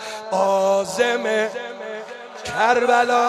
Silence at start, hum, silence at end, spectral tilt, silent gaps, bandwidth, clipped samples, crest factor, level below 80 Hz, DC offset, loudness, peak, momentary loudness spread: 0 s; none; 0 s; -3 dB/octave; none; 14 kHz; under 0.1%; 16 dB; -62 dBFS; under 0.1%; -19 LUFS; -4 dBFS; 15 LU